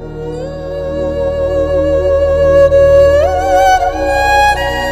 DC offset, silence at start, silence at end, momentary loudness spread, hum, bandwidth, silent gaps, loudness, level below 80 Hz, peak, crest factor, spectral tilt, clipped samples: under 0.1%; 0 s; 0 s; 14 LU; none; 15 kHz; none; -11 LUFS; -24 dBFS; 0 dBFS; 10 dB; -5 dB/octave; under 0.1%